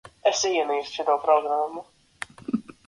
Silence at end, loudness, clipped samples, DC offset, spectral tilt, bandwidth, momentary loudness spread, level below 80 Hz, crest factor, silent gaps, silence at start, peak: 0.25 s; -24 LUFS; under 0.1%; under 0.1%; -2.5 dB/octave; 11.5 kHz; 17 LU; -66 dBFS; 18 dB; none; 0.05 s; -8 dBFS